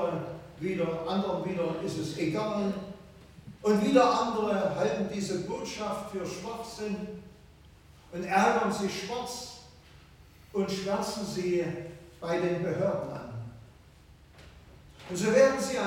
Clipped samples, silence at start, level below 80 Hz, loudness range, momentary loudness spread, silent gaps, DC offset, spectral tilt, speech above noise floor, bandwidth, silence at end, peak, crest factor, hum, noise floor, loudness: under 0.1%; 0 s; -58 dBFS; 6 LU; 18 LU; none; under 0.1%; -5.5 dB/octave; 26 dB; 17 kHz; 0 s; -10 dBFS; 22 dB; none; -55 dBFS; -30 LUFS